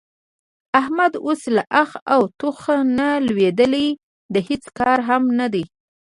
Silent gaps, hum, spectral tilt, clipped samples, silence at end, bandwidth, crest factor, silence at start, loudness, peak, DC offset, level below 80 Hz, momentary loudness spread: 2.02-2.06 s, 4.03-4.29 s; none; -5.5 dB/octave; under 0.1%; 0.35 s; 11.5 kHz; 18 dB; 0.75 s; -19 LUFS; 0 dBFS; under 0.1%; -56 dBFS; 7 LU